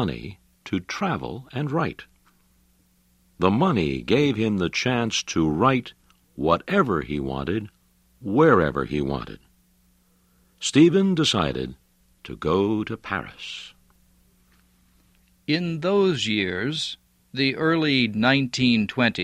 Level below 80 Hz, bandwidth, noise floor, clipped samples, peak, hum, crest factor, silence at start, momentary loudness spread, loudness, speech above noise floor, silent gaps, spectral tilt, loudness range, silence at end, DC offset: -48 dBFS; 13 kHz; -62 dBFS; under 0.1%; -2 dBFS; none; 22 dB; 0 s; 15 LU; -23 LUFS; 40 dB; none; -5.5 dB/octave; 8 LU; 0 s; under 0.1%